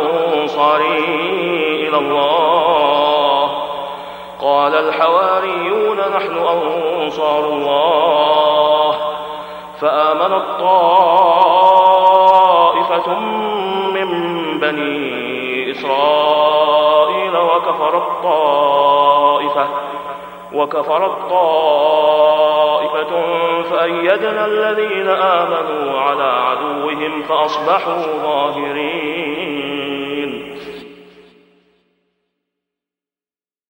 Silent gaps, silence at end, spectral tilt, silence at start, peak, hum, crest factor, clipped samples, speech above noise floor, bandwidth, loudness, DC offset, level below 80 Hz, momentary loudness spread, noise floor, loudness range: none; 2.8 s; -5 dB/octave; 0 s; 0 dBFS; none; 14 dB; under 0.1%; over 76 dB; 16.5 kHz; -14 LUFS; under 0.1%; -58 dBFS; 10 LU; under -90 dBFS; 7 LU